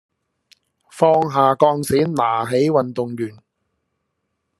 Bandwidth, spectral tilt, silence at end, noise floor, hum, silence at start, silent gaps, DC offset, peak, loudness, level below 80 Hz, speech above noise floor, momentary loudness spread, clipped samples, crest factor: 13 kHz; -6.5 dB/octave; 1.3 s; -74 dBFS; none; 0.95 s; none; under 0.1%; 0 dBFS; -18 LUFS; -60 dBFS; 57 dB; 10 LU; under 0.1%; 20 dB